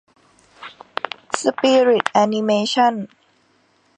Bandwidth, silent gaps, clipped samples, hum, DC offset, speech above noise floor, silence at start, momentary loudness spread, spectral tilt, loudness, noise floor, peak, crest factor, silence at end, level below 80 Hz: 10 kHz; none; under 0.1%; none; under 0.1%; 43 dB; 0.6 s; 22 LU; -4 dB/octave; -18 LUFS; -60 dBFS; 0 dBFS; 20 dB; 0.9 s; -70 dBFS